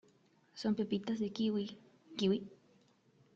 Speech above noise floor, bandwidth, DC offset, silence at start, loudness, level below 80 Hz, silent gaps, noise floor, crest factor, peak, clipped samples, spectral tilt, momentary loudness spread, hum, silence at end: 34 dB; 7.4 kHz; under 0.1%; 0.55 s; -37 LUFS; -76 dBFS; none; -69 dBFS; 18 dB; -22 dBFS; under 0.1%; -6.5 dB/octave; 19 LU; none; 0.8 s